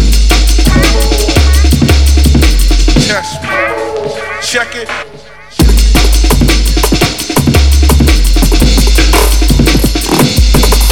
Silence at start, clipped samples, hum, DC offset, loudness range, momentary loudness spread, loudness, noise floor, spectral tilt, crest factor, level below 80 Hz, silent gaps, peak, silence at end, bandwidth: 0 s; 0.9%; none; 1%; 4 LU; 8 LU; -9 LUFS; -32 dBFS; -4.5 dB/octave; 8 dB; -8 dBFS; none; 0 dBFS; 0 s; 18 kHz